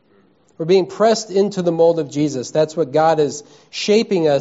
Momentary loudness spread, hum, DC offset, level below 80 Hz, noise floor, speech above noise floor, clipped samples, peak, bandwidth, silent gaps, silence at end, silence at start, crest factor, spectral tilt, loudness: 7 LU; none; under 0.1%; -64 dBFS; -55 dBFS; 39 dB; under 0.1%; -2 dBFS; 8 kHz; none; 0 s; 0.6 s; 14 dB; -5 dB/octave; -17 LUFS